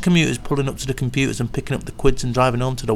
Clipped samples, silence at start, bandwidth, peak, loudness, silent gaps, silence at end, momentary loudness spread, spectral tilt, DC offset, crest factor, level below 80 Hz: under 0.1%; 0 s; 14.5 kHz; 0 dBFS; -21 LUFS; none; 0 s; 7 LU; -5.5 dB/octave; 0.9%; 18 dB; -30 dBFS